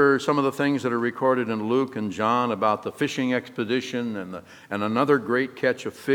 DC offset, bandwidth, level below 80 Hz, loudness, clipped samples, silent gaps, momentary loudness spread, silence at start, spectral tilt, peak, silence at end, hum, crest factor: under 0.1%; 18 kHz; -72 dBFS; -24 LUFS; under 0.1%; none; 8 LU; 0 s; -6 dB/octave; -6 dBFS; 0 s; none; 18 dB